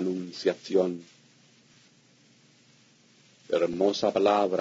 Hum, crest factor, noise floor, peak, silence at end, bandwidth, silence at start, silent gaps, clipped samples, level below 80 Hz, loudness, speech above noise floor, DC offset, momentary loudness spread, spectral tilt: none; 20 dB; -60 dBFS; -10 dBFS; 0 s; 7.8 kHz; 0 s; none; under 0.1%; -74 dBFS; -27 LUFS; 35 dB; under 0.1%; 8 LU; -5.5 dB/octave